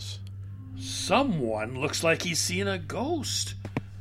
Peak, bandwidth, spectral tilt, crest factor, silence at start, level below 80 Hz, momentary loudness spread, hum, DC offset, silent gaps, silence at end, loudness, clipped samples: -8 dBFS; 16 kHz; -3.5 dB/octave; 22 dB; 0 s; -52 dBFS; 14 LU; none; under 0.1%; none; 0 s; -28 LUFS; under 0.1%